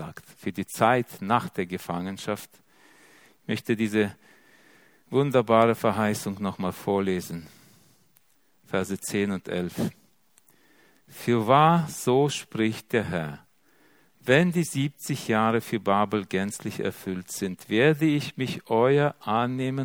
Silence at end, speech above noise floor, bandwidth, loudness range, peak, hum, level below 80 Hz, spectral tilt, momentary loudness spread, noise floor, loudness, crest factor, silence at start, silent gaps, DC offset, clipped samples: 0 s; 40 dB; 19 kHz; 6 LU; -4 dBFS; none; -66 dBFS; -5.5 dB/octave; 12 LU; -65 dBFS; -26 LUFS; 22 dB; 0 s; none; under 0.1%; under 0.1%